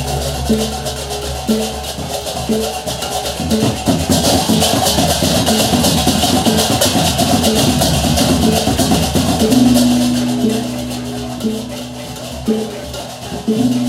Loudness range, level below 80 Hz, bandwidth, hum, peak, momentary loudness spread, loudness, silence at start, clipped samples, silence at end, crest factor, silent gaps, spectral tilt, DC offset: 6 LU; -30 dBFS; 16.5 kHz; none; 0 dBFS; 11 LU; -14 LUFS; 0 s; under 0.1%; 0 s; 14 dB; none; -4 dB/octave; under 0.1%